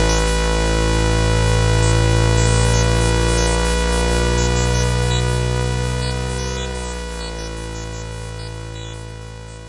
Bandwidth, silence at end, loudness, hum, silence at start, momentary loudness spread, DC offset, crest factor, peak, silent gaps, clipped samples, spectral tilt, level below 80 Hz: 11.5 kHz; 0 s; -18 LUFS; none; 0 s; 14 LU; under 0.1%; 14 dB; -4 dBFS; none; under 0.1%; -4.5 dB/octave; -22 dBFS